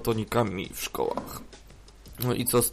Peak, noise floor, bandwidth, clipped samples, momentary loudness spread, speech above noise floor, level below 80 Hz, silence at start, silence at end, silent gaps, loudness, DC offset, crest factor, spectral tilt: -12 dBFS; -48 dBFS; 15.5 kHz; under 0.1%; 18 LU; 20 dB; -50 dBFS; 0 s; 0 s; none; -28 LUFS; under 0.1%; 18 dB; -4.5 dB/octave